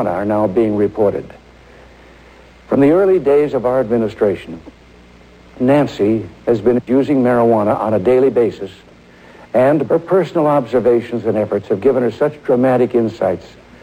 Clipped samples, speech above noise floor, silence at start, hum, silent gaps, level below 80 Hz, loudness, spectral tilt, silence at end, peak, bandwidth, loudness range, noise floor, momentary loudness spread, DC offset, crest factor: under 0.1%; 28 dB; 0 s; none; none; -48 dBFS; -15 LUFS; -8.5 dB/octave; 0.35 s; -2 dBFS; 11 kHz; 2 LU; -43 dBFS; 7 LU; under 0.1%; 14 dB